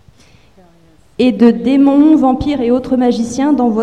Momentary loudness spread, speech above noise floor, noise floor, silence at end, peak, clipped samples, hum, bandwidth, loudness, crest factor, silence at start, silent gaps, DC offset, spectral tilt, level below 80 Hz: 6 LU; 35 dB; -46 dBFS; 0 s; 0 dBFS; under 0.1%; none; 9.6 kHz; -12 LUFS; 12 dB; 1.2 s; none; 0.3%; -6.5 dB/octave; -40 dBFS